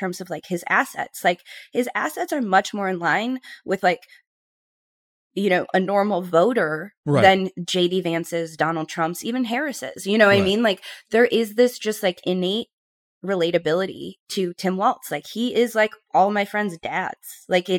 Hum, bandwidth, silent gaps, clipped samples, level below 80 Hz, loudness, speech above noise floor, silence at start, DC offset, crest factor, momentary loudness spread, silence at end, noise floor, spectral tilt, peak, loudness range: none; 18 kHz; 4.27-5.30 s, 6.97-7.03 s, 12.73-13.21 s, 14.20-14.26 s; under 0.1%; -64 dBFS; -22 LUFS; over 68 dB; 0 s; under 0.1%; 20 dB; 11 LU; 0 s; under -90 dBFS; -5 dB/octave; -2 dBFS; 4 LU